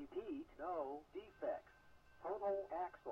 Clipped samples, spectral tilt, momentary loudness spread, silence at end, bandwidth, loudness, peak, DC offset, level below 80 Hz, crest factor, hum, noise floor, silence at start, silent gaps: under 0.1%; -7 dB/octave; 9 LU; 0 s; 7.4 kHz; -47 LUFS; -32 dBFS; under 0.1%; -74 dBFS; 14 dB; none; -66 dBFS; 0 s; none